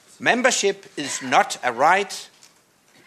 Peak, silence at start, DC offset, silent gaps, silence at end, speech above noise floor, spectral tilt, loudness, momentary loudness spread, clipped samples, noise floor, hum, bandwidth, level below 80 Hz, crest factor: -2 dBFS; 0.2 s; under 0.1%; none; 0.8 s; 37 dB; -2 dB/octave; -20 LUFS; 12 LU; under 0.1%; -57 dBFS; none; 14 kHz; -72 dBFS; 20 dB